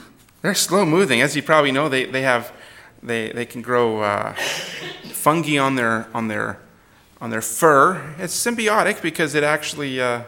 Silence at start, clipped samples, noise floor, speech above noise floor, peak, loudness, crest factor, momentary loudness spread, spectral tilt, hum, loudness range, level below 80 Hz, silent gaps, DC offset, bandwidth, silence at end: 0 s; under 0.1%; -52 dBFS; 32 dB; 0 dBFS; -19 LUFS; 20 dB; 12 LU; -3.5 dB/octave; none; 4 LU; -62 dBFS; none; under 0.1%; 17.5 kHz; 0 s